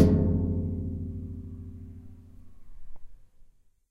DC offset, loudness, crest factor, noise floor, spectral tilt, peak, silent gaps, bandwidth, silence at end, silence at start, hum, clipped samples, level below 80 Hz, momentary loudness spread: under 0.1%; -30 LUFS; 24 dB; -55 dBFS; -10 dB/octave; -6 dBFS; none; 6 kHz; 0.45 s; 0 s; none; under 0.1%; -42 dBFS; 23 LU